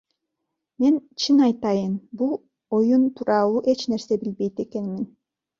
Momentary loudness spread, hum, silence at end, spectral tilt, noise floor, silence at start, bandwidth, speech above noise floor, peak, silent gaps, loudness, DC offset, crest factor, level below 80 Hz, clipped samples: 11 LU; none; 0.55 s; -6 dB/octave; -81 dBFS; 0.8 s; 7.6 kHz; 59 dB; -8 dBFS; none; -23 LUFS; under 0.1%; 16 dB; -66 dBFS; under 0.1%